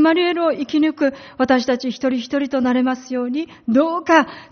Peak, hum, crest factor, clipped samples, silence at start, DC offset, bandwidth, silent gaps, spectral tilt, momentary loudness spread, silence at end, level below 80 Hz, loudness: 0 dBFS; none; 18 dB; under 0.1%; 0 s; under 0.1%; 6.6 kHz; none; -2.5 dB/octave; 8 LU; 0.05 s; -58 dBFS; -19 LUFS